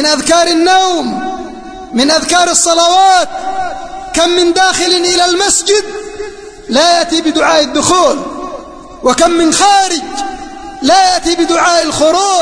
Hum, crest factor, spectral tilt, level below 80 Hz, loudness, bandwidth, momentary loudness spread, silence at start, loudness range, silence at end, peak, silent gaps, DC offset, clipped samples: none; 10 dB; -1.5 dB/octave; -38 dBFS; -9 LUFS; 11 kHz; 16 LU; 0 s; 2 LU; 0 s; 0 dBFS; none; under 0.1%; under 0.1%